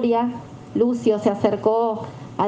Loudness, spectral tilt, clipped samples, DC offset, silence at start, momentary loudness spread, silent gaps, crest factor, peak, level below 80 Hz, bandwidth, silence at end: -21 LUFS; -7.5 dB/octave; under 0.1%; under 0.1%; 0 s; 11 LU; none; 16 dB; -4 dBFS; -60 dBFS; 8.6 kHz; 0 s